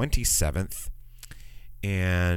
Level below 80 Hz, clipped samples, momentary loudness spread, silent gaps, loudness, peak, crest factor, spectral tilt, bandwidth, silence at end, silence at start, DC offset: -34 dBFS; under 0.1%; 24 LU; none; -27 LUFS; -10 dBFS; 16 dB; -4 dB/octave; 17 kHz; 0 s; 0 s; under 0.1%